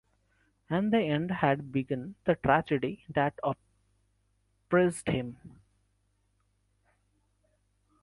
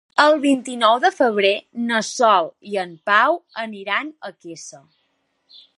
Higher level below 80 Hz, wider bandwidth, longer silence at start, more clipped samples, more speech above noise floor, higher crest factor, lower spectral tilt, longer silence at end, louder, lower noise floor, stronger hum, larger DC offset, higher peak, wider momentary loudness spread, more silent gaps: first, -60 dBFS vs -76 dBFS; about the same, 11.5 kHz vs 11.5 kHz; first, 0.7 s vs 0.15 s; neither; second, 44 dB vs 50 dB; about the same, 24 dB vs 20 dB; first, -6.5 dB/octave vs -3 dB/octave; first, 2.55 s vs 1 s; second, -30 LUFS vs -18 LUFS; first, -73 dBFS vs -69 dBFS; first, 50 Hz at -65 dBFS vs none; neither; second, -10 dBFS vs 0 dBFS; second, 9 LU vs 19 LU; neither